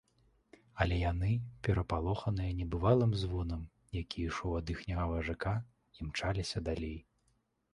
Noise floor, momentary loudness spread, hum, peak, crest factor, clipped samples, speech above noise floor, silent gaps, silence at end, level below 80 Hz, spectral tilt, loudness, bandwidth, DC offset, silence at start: -76 dBFS; 12 LU; none; -14 dBFS; 20 dB; under 0.1%; 42 dB; none; 0.7 s; -44 dBFS; -7 dB/octave; -35 LUFS; 11 kHz; under 0.1%; 0.75 s